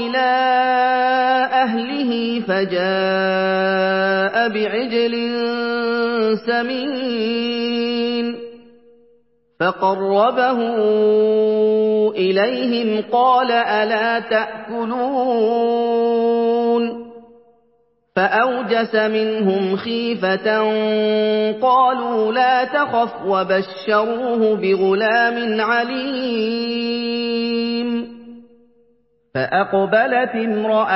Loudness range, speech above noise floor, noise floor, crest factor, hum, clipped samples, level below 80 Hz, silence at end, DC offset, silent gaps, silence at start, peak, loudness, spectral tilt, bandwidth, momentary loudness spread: 4 LU; 43 dB; -61 dBFS; 14 dB; none; under 0.1%; -66 dBFS; 0 s; under 0.1%; none; 0 s; -4 dBFS; -18 LUFS; -9.5 dB/octave; 5.8 kHz; 6 LU